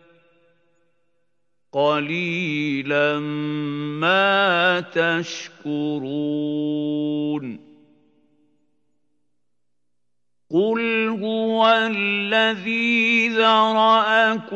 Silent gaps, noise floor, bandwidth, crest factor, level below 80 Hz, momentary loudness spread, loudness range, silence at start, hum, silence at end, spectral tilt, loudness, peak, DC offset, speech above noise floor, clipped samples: none; -82 dBFS; 8 kHz; 18 dB; -84 dBFS; 10 LU; 11 LU; 1.75 s; 60 Hz at -60 dBFS; 0 s; -5 dB/octave; -20 LUFS; -4 dBFS; under 0.1%; 61 dB; under 0.1%